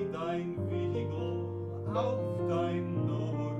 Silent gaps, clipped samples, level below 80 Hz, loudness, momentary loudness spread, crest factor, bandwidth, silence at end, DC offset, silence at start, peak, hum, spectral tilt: none; under 0.1%; -64 dBFS; -34 LUFS; 4 LU; 14 dB; 8 kHz; 0 s; under 0.1%; 0 s; -20 dBFS; none; -9 dB/octave